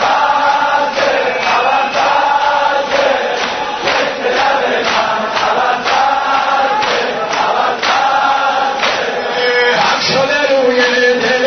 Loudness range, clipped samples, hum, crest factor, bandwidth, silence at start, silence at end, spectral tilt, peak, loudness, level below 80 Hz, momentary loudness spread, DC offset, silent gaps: 2 LU; under 0.1%; none; 12 dB; 6.6 kHz; 0 s; 0 s; -2.5 dB/octave; 0 dBFS; -12 LUFS; -50 dBFS; 4 LU; under 0.1%; none